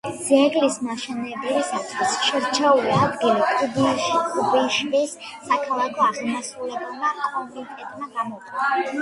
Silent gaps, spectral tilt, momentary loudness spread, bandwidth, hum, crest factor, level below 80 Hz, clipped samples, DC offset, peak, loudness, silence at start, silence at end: none; -3.5 dB/octave; 12 LU; 11.5 kHz; none; 18 dB; -62 dBFS; under 0.1%; under 0.1%; -4 dBFS; -22 LUFS; 0.05 s; 0 s